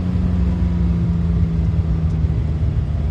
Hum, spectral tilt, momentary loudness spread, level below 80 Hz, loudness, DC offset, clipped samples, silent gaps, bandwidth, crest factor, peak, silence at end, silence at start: none; -10 dB/octave; 2 LU; -22 dBFS; -19 LUFS; under 0.1%; under 0.1%; none; 5.8 kHz; 12 dB; -6 dBFS; 0 s; 0 s